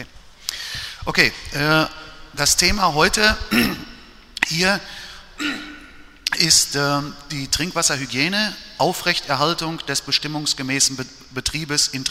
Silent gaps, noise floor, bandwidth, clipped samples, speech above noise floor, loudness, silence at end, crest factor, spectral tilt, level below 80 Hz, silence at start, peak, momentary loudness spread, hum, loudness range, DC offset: none; -43 dBFS; 16 kHz; under 0.1%; 22 dB; -19 LUFS; 0 s; 22 dB; -2 dB/octave; -40 dBFS; 0 s; 0 dBFS; 16 LU; none; 3 LU; under 0.1%